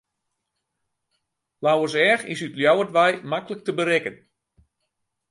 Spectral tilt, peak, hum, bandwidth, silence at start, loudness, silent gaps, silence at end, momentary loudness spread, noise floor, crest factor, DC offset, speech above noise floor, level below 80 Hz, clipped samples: -4.5 dB/octave; -4 dBFS; none; 11.5 kHz; 1.6 s; -21 LUFS; none; 1.15 s; 10 LU; -79 dBFS; 20 dB; under 0.1%; 58 dB; -72 dBFS; under 0.1%